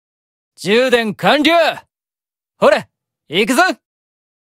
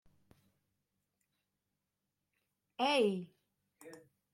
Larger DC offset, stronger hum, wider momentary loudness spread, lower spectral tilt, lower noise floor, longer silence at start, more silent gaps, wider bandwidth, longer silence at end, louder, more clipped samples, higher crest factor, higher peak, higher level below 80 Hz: neither; neither; second, 11 LU vs 25 LU; about the same, -4 dB/octave vs -5 dB/octave; about the same, under -90 dBFS vs -88 dBFS; second, 0.6 s vs 2.8 s; neither; about the same, 16 kHz vs 15.5 kHz; first, 0.75 s vs 0.35 s; first, -14 LUFS vs -34 LUFS; neither; second, 16 dB vs 22 dB; first, 0 dBFS vs -20 dBFS; first, -58 dBFS vs -86 dBFS